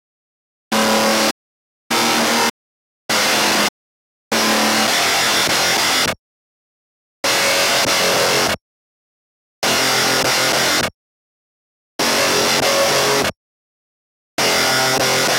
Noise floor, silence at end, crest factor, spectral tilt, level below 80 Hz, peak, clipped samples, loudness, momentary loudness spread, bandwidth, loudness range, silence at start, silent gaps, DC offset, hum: under -90 dBFS; 0 s; 14 dB; -1.5 dB/octave; -54 dBFS; -4 dBFS; under 0.1%; -15 LUFS; 7 LU; 17 kHz; 2 LU; 0.7 s; 1.31-1.90 s, 2.50-3.09 s, 3.69-4.31 s, 6.19-7.23 s, 8.61-9.62 s, 10.94-11.99 s, 13.36-14.37 s; under 0.1%; none